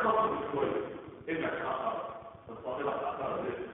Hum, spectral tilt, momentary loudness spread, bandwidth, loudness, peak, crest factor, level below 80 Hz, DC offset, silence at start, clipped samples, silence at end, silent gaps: none; -1 dB/octave; 12 LU; 3.9 kHz; -35 LUFS; -16 dBFS; 18 dB; -64 dBFS; under 0.1%; 0 s; under 0.1%; 0 s; none